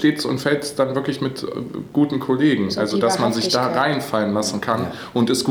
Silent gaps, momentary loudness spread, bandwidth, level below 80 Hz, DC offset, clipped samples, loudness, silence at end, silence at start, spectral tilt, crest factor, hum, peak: none; 7 LU; 20 kHz; -58 dBFS; under 0.1%; under 0.1%; -20 LUFS; 0 s; 0 s; -5 dB/octave; 16 dB; none; -4 dBFS